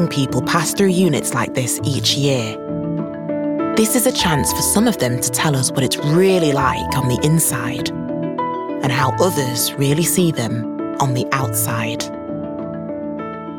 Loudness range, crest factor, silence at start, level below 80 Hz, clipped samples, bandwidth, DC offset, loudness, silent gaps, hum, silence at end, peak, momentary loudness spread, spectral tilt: 3 LU; 16 dB; 0 s; -46 dBFS; under 0.1%; 18.5 kHz; under 0.1%; -18 LUFS; none; none; 0 s; -2 dBFS; 10 LU; -4.5 dB/octave